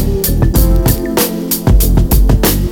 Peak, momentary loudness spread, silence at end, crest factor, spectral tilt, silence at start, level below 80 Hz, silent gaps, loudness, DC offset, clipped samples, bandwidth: 0 dBFS; 3 LU; 0 s; 10 dB; -5.5 dB/octave; 0 s; -12 dBFS; none; -12 LUFS; under 0.1%; under 0.1%; 19.5 kHz